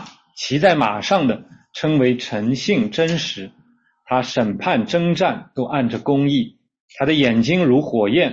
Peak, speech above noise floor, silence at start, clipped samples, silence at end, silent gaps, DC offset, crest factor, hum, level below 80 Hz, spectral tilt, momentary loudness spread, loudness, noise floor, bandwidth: -2 dBFS; 39 dB; 0 s; under 0.1%; 0 s; 6.80-6.88 s; under 0.1%; 16 dB; none; -56 dBFS; -6 dB/octave; 10 LU; -19 LUFS; -57 dBFS; 8 kHz